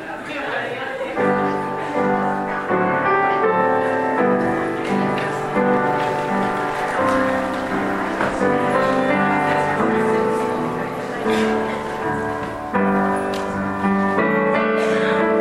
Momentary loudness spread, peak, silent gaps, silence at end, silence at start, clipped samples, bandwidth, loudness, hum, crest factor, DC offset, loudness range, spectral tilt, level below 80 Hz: 6 LU; -4 dBFS; none; 0 s; 0 s; under 0.1%; 15 kHz; -20 LUFS; none; 14 dB; under 0.1%; 2 LU; -6.5 dB/octave; -50 dBFS